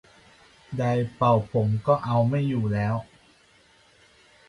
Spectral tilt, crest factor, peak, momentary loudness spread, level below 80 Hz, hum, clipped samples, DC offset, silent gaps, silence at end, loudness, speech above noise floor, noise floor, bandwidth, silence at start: -9 dB/octave; 20 dB; -6 dBFS; 7 LU; -54 dBFS; none; under 0.1%; under 0.1%; none; 1.45 s; -25 LUFS; 35 dB; -58 dBFS; 10.5 kHz; 0.7 s